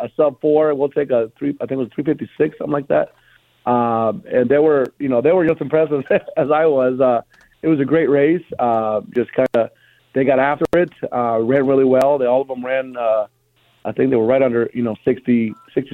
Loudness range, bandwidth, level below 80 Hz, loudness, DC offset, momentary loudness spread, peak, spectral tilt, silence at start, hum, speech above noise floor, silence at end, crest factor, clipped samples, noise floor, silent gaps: 3 LU; 7.8 kHz; -56 dBFS; -18 LUFS; under 0.1%; 8 LU; -2 dBFS; -8.5 dB/octave; 0 s; none; 42 dB; 0.05 s; 16 dB; under 0.1%; -58 dBFS; none